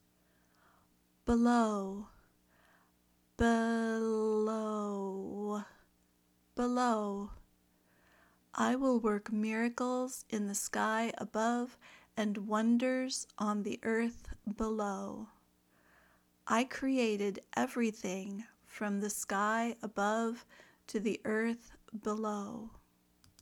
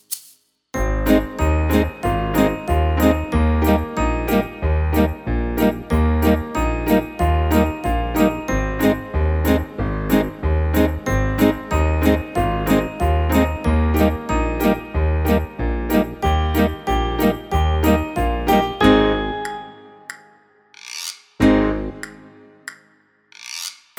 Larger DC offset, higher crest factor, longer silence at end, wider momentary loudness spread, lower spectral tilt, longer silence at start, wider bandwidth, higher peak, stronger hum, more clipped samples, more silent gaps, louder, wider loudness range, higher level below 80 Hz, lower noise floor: neither; about the same, 18 dB vs 18 dB; first, 0.75 s vs 0.25 s; about the same, 14 LU vs 12 LU; second, -4.5 dB/octave vs -6.5 dB/octave; first, 1.25 s vs 0.1 s; second, 17.5 kHz vs over 20 kHz; second, -18 dBFS vs 0 dBFS; first, 60 Hz at -75 dBFS vs none; neither; neither; second, -35 LUFS vs -19 LUFS; about the same, 4 LU vs 2 LU; second, -60 dBFS vs -24 dBFS; first, -72 dBFS vs -57 dBFS